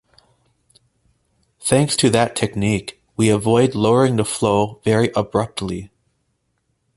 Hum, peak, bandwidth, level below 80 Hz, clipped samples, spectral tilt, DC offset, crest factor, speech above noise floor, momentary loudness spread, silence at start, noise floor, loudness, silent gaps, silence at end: none; -2 dBFS; 12 kHz; -48 dBFS; under 0.1%; -5 dB/octave; under 0.1%; 18 dB; 52 dB; 10 LU; 1.6 s; -69 dBFS; -18 LUFS; none; 1.1 s